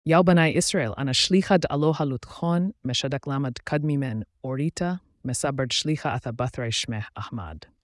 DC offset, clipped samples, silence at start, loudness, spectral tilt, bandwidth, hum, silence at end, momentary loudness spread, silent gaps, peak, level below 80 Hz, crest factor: under 0.1%; under 0.1%; 0.05 s; -25 LUFS; -5 dB/octave; 12 kHz; none; 0.25 s; 13 LU; none; -8 dBFS; -54 dBFS; 16 dB